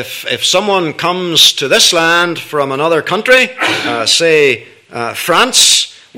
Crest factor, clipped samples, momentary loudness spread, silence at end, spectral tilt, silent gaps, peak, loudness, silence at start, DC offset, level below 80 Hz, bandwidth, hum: 12 dB; 0.5%; 10 LU; 0 s; -1.5 dB/octave; none; 0 dBFS; -10 LUFS; 0 s; under 0.1%; -54 dBFS; over 20 kHz; none